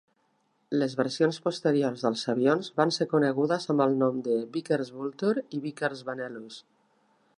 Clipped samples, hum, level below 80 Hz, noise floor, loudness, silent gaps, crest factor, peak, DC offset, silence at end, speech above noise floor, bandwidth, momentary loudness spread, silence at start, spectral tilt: under 0.1%; none; -80 dBFS; -71 dBFS; -28 LUFS; none; 20 dB; -8 dBFS; under 0.1%; 0.75 s; 44 dB; 11 kHz; 11 LU; 0.7 s; -6 dB/octave